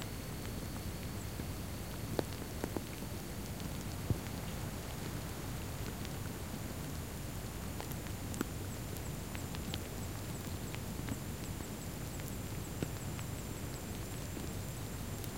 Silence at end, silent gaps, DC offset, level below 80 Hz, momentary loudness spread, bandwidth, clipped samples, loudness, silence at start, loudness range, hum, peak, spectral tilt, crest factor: 0 s; none; 0.1%; -50 dBFS; 3 LU; 17 kHz; under 0.1%; -42 LUFS; 0 s; 1 LU; none; -16 dBFS; -5 dB/octave; 26 dB